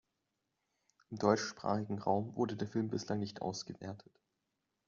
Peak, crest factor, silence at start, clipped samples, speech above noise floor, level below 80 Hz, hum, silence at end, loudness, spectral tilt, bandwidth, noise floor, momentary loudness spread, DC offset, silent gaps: -14 dBFS; 24 dB; 1.1 s; under 0.1%; 49 dB; -76 dBFS; none; 0.85 s; -37 LUFS; -5.5 dB/octave; 7.4 kHz; -86 dBFS; 15 LU; under 0.1%; none